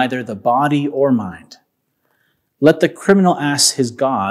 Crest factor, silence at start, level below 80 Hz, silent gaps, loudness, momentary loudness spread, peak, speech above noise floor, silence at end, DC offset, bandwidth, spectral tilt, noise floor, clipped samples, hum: 16 dB; 0 s; -60 dBFS; none; -15 LUFS; 7 LU; 0 dBFS; 51 dB; 0 s; under 0.1%; 15.5 kHz; -4 dB/octave; -67 dBFS; under 0.1%; none